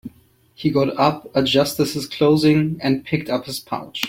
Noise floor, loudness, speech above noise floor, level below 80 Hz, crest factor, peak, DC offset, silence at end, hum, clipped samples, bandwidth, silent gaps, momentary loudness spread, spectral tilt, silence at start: -54 dBFS; -19 LUFS; 35 dB; -54 dBFS; 18 dB; -2 dBFS; under 0.1%; 0 s; none; under 0.1%; 16.5 kHz; none; 9 LU; -5.5 dB/octave; 0.05 s